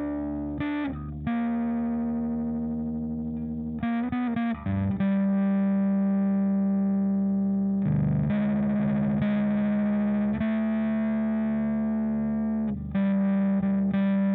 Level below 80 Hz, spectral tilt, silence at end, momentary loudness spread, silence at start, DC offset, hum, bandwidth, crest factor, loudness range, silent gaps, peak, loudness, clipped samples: -48 dBFS; -12 dB/octave; 0 s; 6 LU; 0 s; under 0.1%; none; 3.9 kHz; 10 dB; 4 LU; none; -14 dBFS; -26 LUFS; under 0.1%